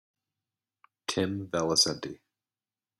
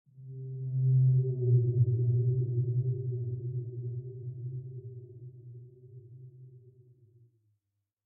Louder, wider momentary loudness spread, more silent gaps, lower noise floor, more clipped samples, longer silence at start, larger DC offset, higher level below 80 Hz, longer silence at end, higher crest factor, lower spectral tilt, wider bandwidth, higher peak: first, -28 LUFS vs -31 LUFS; second, 15 LU vs 24 LU; neither; first, under -90 dBFS vs -84 dBFS; neither; first, 1.1 s vs 0.15 s; neither; about the same, -66 dBFS vs -66 dBFS; second, 0.85 s vs 1.45 s; first, 22 dB vs 16 dB; second, -3 dB/octave vs -19 dB/octave; first, 15.5 kHz vs 0.7 kHz; first, -12 dBFS vs -16 dBFS